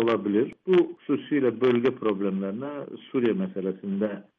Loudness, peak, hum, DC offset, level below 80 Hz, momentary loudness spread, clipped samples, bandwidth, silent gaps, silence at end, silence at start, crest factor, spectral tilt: -26 LUFS; -12 dBFS; none; under 0.1%; -72 dBFS; 9 LU; under 0.1%; 5 kHz; none; 0.15 s; 0 s; 14 dB; -9 dB/octave